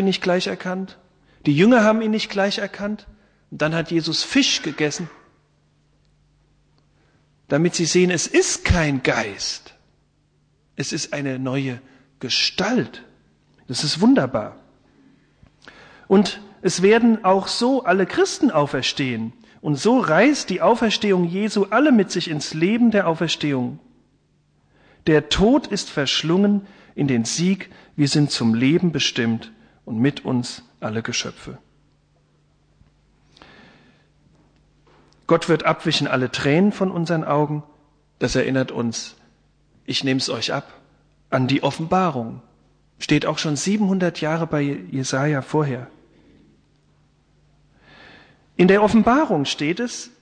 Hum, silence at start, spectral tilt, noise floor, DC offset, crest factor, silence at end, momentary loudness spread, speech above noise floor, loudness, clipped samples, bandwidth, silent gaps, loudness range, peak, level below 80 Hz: none; 0 s; -5 dB/octave; -62 dBFS; under 0.1%; 18 dB; 0.15 s; 13 LU; 43 dB; -20 LUFS; under 0.1%; 10 kHz; none; 7 LU; -4 dBFS; -46 dBFS